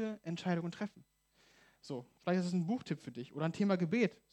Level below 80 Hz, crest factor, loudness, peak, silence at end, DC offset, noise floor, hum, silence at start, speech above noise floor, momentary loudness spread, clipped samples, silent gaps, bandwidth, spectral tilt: -80 dBFS; 20 dB; -37 LUFS; -18 dBFS; 0.2 s; under 0.1%; -71 dBFS; none; 0 s; 34 dB; 13 LU; under 0.1%; none; 9.2 kHz; -7 dB/octave